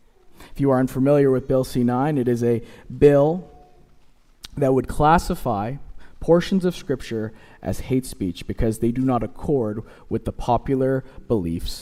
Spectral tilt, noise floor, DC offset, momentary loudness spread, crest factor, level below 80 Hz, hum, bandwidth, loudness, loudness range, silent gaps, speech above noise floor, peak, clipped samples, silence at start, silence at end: -7.5 dB/octave; -52 dBFS; under 0.1%; 13 LU; 18 dB; -38 dBFS; none; 16 kHz; -22 LUFS; 5 LU; none; 31 dB; -2 dBFS; under 0.1%; 0.3 s; 0 s